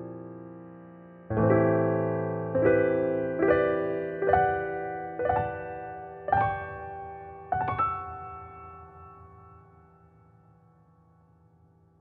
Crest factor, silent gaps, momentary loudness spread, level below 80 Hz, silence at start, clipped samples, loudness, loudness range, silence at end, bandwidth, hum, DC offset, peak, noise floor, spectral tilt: 20 dB; none; 23 LU; -54 dBFS; 0 s; under 0.1%; -27 LUFS; 10 LU; 2.45 s; 4.3 kHz; none; under 0.1%; -8 dBFS; -61 dBFS; -11.5 dB/octave